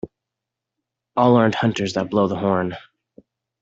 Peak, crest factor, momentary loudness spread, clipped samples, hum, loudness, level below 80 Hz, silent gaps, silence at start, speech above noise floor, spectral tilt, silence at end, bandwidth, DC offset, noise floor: -4 dBFS; 18 dB; 13 LU; under 0.1%; none; -20 LUFS; -58 dBFS; none; 0.05 s; 65 dB; -6.5 dB/octave; 0.8 s; 7.8 kHz; under 0.1%; -84 dBFS